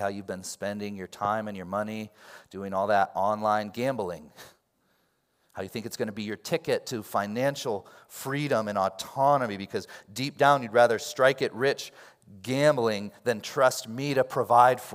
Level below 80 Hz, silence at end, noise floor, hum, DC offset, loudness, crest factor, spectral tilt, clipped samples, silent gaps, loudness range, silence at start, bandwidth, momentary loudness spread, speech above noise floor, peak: -74 dBFS; 0 s; -71 dBFS; none; under 0.1%; -27 LUFS; 22 dB; -4.5 dB/octave; under 0.1%; none; 7 LU; 0 s; 16 kHz; 14 LU; 44 dB; -6 dBFS